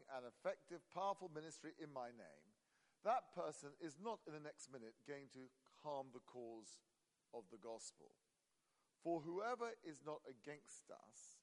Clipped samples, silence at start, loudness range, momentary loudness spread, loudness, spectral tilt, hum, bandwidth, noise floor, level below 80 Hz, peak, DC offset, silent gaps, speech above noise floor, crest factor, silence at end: under 0.1%; 0 s; 7 LU; 15 LU; -51 LUFS; -4.5 dB/octave; none; 11.5 kHz; -87 dBFS; under -90 dBFS; -30 dBFS; under 0.1%; none; 36 dB; 22 dB; 0.05 s